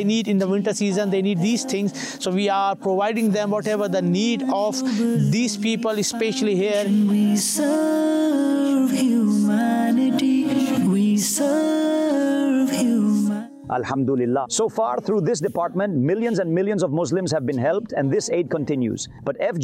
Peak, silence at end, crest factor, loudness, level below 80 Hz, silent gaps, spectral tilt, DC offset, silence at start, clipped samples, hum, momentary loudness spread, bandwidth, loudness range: -12 dBFS; 0 s; 8 dB; -21 LUFS; -64 dBFS; none; -5 dB/octave; under 0.1%; 0 s; under 0.1%; none; 4 LU; 16 kHz; 3 LU